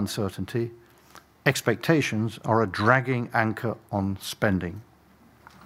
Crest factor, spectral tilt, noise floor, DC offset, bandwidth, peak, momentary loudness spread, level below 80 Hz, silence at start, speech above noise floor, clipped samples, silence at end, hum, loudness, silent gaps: 24 dB; -5.5 dB/octave; -56 dBFS; under 0.1%; 16 kHz; -2 dBFS; 9 LU; -60 dBFS; 0 s; 31 dB; under 0.1%; 0.85 s; none; -26 LUFS; none